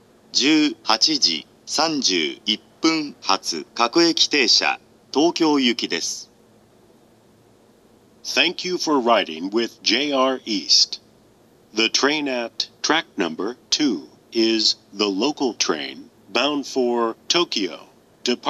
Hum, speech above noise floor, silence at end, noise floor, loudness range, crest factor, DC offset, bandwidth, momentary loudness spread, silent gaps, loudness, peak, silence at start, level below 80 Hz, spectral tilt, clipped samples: none; 33 dB; 0 s; -54 dBFS; 5 LU; 22 dB; under 0.1%; 12.5 kHz; 11 LU; none; -20 LUFS; 0 dBFS; 0.35 s; -72 dBFS; -1.5 dB/octave; under 0.1%